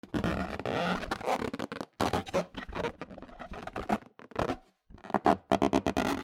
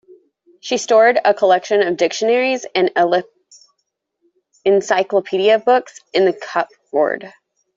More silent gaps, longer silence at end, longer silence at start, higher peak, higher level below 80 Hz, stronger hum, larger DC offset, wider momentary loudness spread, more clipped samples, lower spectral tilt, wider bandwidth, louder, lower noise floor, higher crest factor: neither; second, 0 s vs 0.45 s; second, 0.05 s vs 0.65 s; second, -8 dBFS vs -2 dBFS; first, -50 dBFS vs -66 dBFS; neither; neither; first, 14 LU vs 9 LU; neither; first, -5.5 dB/octave vs -3.5 dB/octave; first, 16.5 kHz vs 7.8 kHz; second, -32 LUFS vs -16 LUFS; second, -54 dBFS vs -73 dBFS; first, 24 dB vs 14 dB